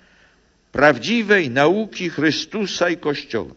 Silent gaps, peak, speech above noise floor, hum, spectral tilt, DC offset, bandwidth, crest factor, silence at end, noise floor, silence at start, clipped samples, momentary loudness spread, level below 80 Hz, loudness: none; 0 dBFS; 39 dB; none; -4.5 dB/octave; under 0.1%; 8 kHz; 20 dB; 0.05 s; -57 dBFS; 0.75 s; under 0.1%; 9 LU; -54 dBFS; -19 LUFS